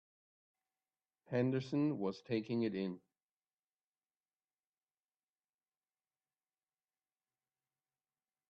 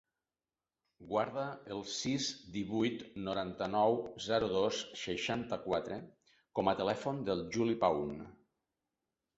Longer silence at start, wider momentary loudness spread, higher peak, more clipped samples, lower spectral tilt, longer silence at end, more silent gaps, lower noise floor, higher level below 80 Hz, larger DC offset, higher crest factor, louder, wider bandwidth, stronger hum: first, 1.3 s vs 1 s; second, 7 LU vs 10 LU; second, -24 dBFS vs -16 dBFS; neither; first, -7 dB/octave vs -4 dB/octave; first, 5.55 s vs 1.05 s; neither; about the same, under -90 dBFS vs under -90 dBFS; second, -84 dBFS vs -66 dBFS; neither; about the same, 20 dB vs 20 dB; about the same, -38 LUFS vs -36 LUFS; about the same, 7.6 kHz vs 8 kHz; neither